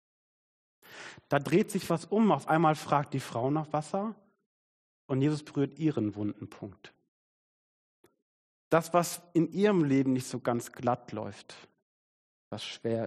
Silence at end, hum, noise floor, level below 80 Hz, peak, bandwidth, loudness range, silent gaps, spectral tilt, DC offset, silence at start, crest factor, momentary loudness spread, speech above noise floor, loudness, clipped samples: 0 s; none; under -90 dBFS; -72 dBFS; -10 dBFS; 13.5 kHz; 6 LU; 4.46-5.09 s, 7.08-8.04 s, 8.22-8.71 s, 11.82-12.51 s; -6.5 dB/octave; under 0.1%; 0.9 s; 20 dB; 17 LU; over 61 dB; -30 LUFS; under 0.1%